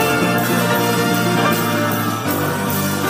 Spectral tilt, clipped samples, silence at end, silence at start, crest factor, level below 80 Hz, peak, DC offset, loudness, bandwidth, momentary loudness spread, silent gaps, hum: -4.5 dB/octave; under 0.1%; 0 s; 0 s; 14 dB; -54 dBFS; -4 dBFS; under 0.1%; -17 LUFS; 16 kHz; 3 LU; none; none